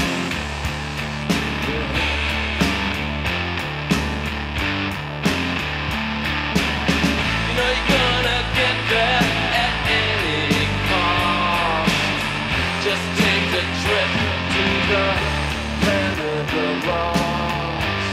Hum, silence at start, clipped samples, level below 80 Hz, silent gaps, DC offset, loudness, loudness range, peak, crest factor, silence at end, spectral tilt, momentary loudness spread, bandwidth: none; 0 s; under 0.1%; -32 dBFS; none; under 0.1%; -20 LUFS; 4 LU; -2 dBFS; 18 dB; 0 s; -4.5 dB/octave; 6 LU; 16 kHz